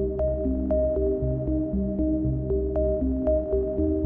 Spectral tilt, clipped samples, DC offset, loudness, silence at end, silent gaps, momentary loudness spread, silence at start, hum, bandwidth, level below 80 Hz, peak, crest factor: -14 dB/octave; under 0.1%; under 0.1%; -26 LUFS; 0 s; none; 2 LU; 0 s; none; 2.1 kHz; -32 dBFS; -14 dBFS; 12 dB